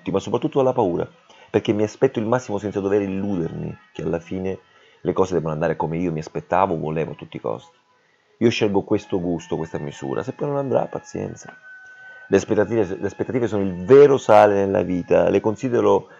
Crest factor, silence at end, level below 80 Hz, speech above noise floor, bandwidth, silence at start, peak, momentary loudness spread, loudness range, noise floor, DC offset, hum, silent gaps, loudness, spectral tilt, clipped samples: 20 dB; 0.15 s; -56 dBFS; 41 dB; 7.8 kHz; 0.05 s; 0 dBFS; 15 LU; 8 LU; -61 dBFS; under 0.1%; none; none; -21 LUFS; -7 dB/octave; under 0.1%